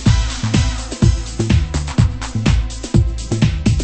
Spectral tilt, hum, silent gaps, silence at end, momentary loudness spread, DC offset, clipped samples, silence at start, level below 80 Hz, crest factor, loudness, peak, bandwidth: -5.5 dB/octave; none; none; 0 s; 4 LU; under 0.1%; under 0.1%; 0 s; -20 dBFS; 16 dB; -18 LUFS; 0 dBFS; 8.8 kHz